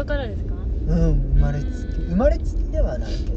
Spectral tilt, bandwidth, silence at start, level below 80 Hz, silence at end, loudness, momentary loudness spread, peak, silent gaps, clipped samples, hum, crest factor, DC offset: -8.5 dB/octave; 7 kHz; 0 s; -22 dBFS; 0 s; -23 LUFS; 8 LU; -6 dBFS; none; under 0.1%; none; 14 dB; under 0.1%